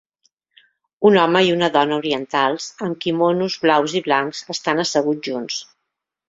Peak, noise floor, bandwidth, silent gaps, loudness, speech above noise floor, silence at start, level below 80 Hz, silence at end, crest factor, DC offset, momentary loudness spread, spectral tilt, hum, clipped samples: -2 dBFS; -79 dBFS; 7.8 kHz; none; -19 LUFS; 60 dB; 1 s; -62 dBFS; 0.65 s; 18 dB; under 0.1%; 10 LU; -4.5 dB/octave; none; under 0.1%